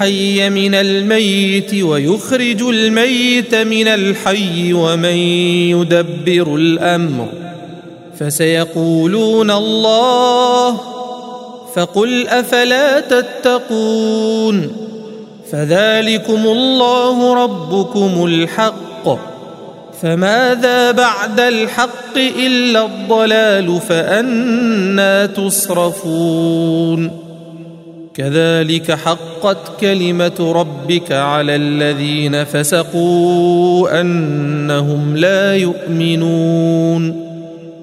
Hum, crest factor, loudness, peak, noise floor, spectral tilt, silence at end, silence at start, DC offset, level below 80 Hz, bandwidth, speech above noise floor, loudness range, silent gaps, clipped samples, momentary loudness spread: none; 14 dB; -13 LUFS; 0 dBFS; -33 dBFS; -5 dB/octave; 0 s; 0 s; under 0.1%; -60 dBFS; 16 kHz; 20 dB; 3 LU; none; under 0.1%; 11 LU